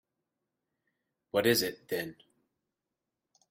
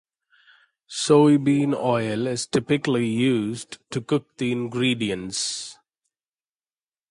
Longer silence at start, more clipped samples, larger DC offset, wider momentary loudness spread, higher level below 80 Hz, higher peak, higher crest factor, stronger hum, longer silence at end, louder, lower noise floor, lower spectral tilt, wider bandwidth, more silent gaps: first, 1.35 s vs 0.9 s; neither; neither; second, 10 LU vs 15 LU; second, -72 dBFS vs -62 dBFS; second, -12 dBFS vs -4 dBFS; first, 24 dB vs 18 dB; neither; about the same, 1.4 s vs 1.35 s; second, -30 LUFS vs -23 LUFS; about the same, -88 dBFS vs under -90 dBFS; second, -3.5 dB/octave vs -5 dB/octave; first, 16.5 kHz vs 11.5 kHz; neither